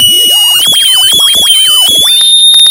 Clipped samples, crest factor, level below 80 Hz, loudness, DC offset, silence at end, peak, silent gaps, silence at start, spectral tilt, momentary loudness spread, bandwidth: 1%; 4 dB; -44 dBFS; -2 LUFS; under 0.1%; 0 s; 0 dBFS; none; 0 s; 2 dB/octave; 2 LU; over 20 kHz